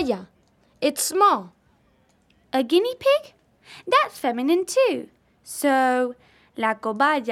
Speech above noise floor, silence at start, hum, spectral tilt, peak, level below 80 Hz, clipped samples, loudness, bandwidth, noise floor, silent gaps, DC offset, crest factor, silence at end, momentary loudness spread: 40 dB; 0 s; none; -2.5 dB/octave; -6 dBFS; -66 dBFS; under 0.1%; -22 LUFS; 16 kHz; -62 dBFS; none; under 0.1%; 18 dB; 0 s; 10 LU